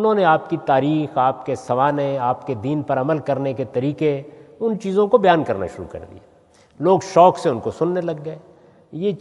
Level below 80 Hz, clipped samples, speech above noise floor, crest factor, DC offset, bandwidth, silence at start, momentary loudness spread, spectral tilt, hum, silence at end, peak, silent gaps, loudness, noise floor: -60 dBFS; under 0.1%; 34 dB; 18 dB; under 0.1%; 11.5 kHz; 0 s; 14 LU; -7 dB/octave; none; 0 s; 0 dBFS; none; -19 LUFS; -53 dBFS